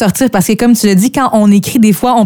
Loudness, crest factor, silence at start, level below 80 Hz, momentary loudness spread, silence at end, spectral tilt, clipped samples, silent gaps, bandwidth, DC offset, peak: -9 LUFS; 8 dB; 0 s; -42 dBFS; 2 LU; 0 s; -5.5 dB/octave; under 0.1%; none; 19 kHz; under 0.1%; 0 dBFS